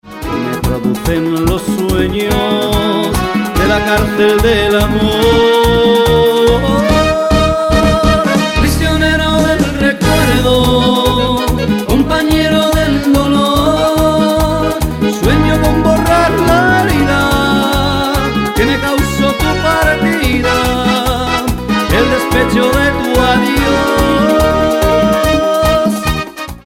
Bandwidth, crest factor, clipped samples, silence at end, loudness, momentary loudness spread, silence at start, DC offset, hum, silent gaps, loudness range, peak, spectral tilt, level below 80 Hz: 16.5 kHz; 12 dB; under 0.1%; 0.05 s; -11 LUFS; 5 LU; 0.05 s; under 0.1%; none; none; 2 LU; 0 dBFS; -5 dB/octave; -22 dBFS